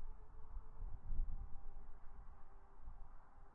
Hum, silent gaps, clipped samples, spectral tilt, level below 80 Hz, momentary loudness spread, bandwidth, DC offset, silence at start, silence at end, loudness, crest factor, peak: none; none; under 0.1%; -7 dB/octave; -48 dBFS; 14 LU; 1.9 kHz; under 0.1%; 0 s; 0 s; -57 LUFS; 18 dB; -28 dBFS